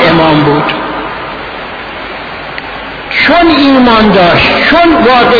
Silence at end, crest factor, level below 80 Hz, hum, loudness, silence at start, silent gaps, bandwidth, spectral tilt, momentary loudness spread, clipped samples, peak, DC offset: 0 s; 8 dB; -32 dBFS; none; -6 LUFS; 0 s; none; 5.4 kHz; -7 dB/octave; 15 LU; 1%; 0 dBFS; under 0.1%